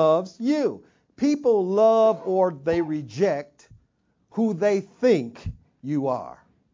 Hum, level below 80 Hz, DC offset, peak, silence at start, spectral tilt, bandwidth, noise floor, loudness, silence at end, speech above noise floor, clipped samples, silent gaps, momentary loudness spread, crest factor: none; -52 dBFS; under 0.1%; -8 dBFS; 0 s; -7 dB/octave; 7.6 kHz; -68 dBFS; -23 LUFS; 0.45 s; 45 dB; under 0.1%; none; 16 LU; 16 dB